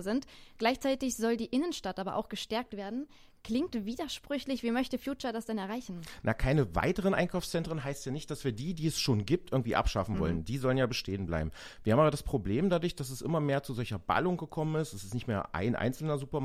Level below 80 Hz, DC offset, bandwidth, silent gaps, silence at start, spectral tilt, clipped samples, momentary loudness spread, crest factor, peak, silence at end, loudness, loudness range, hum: -48 dBFS; under 0.1%; 16 kHz; none; 0 s; -6 dB/octave; under 0.1%; 8 LU; 20 dB; -12 dBFS; 0 s; -33 LUFS; 5 LU; none